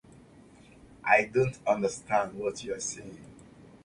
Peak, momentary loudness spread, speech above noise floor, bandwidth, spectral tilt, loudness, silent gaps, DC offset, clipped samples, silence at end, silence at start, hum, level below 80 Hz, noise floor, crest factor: -6 dBFS; 16 LU; 26 dB; 11.5 kHz; -4.5 dB/octave; -29 LUFS; none; under 0.1%; under 0.1%; 0.4 s; 0.9 s; none; -62 dBFS; -55 dBFS; 24 dB